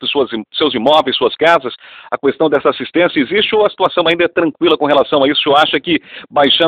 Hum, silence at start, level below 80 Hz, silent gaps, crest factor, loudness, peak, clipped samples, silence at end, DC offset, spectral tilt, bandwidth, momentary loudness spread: none; 0 s; -54 dBFS; none; 14 dB; -13 LUFS; 0 dBFS; 0.2%; 0 s; under 0.1%; -5.5 dB/octave; 10 kHz; 7 LU